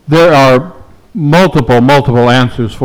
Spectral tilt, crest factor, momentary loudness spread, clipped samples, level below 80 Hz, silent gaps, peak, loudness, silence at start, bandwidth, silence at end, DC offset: -6.5 dB/octave; 8 dB; 10 LU; under 0.1%; -34 dBFS; none; 0 dBFS; -8 LUFS; 0.05 s; over 20 kHz; 0 s; under 0.1%